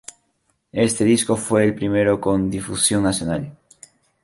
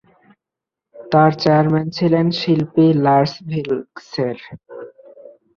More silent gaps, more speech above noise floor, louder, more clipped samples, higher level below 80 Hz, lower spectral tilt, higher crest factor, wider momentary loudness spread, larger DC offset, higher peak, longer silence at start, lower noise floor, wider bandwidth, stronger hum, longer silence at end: neither; second, 49 dB vs 69 dB; about the same, -19 LUFS vs -17 LUFS; neither; first, -46 dBFS vs -58 dBFS; second, -4.5 dB/octave vs -8 dB/octave; about the same, 16 dB vs 16 dB; second, 10 LU vs 19 LU; neither; about the same, -4 dBFS vs -2 dBFS; second, 0.75 s vs 0.95 s; second, -68 dBFS vs -85 dBFS; first, 12 kHz vs 6.8 kHz; neither; about the same, 0.7 s vs 0.7 s